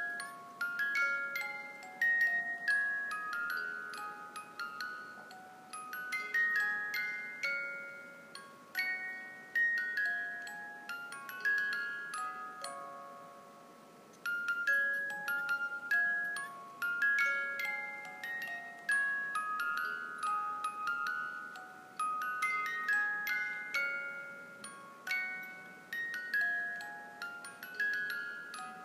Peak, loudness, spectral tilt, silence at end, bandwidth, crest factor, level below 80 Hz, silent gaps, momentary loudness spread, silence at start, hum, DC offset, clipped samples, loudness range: -20 dBFS; -35 LUFS; -1 dB/octave; 0 s; 15.5 kHz; 18 dB; under -90 dBFS; none; 16 LU; 0 s; none; under 0.1%; under 0.1%; 5 LU